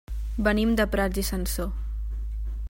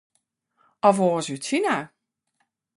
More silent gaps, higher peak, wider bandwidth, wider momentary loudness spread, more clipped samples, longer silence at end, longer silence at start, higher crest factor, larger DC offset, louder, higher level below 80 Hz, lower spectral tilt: neither; second, -8 dBFS vs -4 dBFS; first, 16.5 kHz vs 11.5 kHz; about the same, 11 LU vs 9 LU; neither; second, 0.05 s vs 0.9 s; second, 0.1 s vs 0.85 s; about the same, 18 dB vs 22 dB; neither; second, -27 LUFS vs -23 LUFS; first, -30 dBFS vs -68 dBFS; about the same, -5 dB/octave vs -5 dB/octave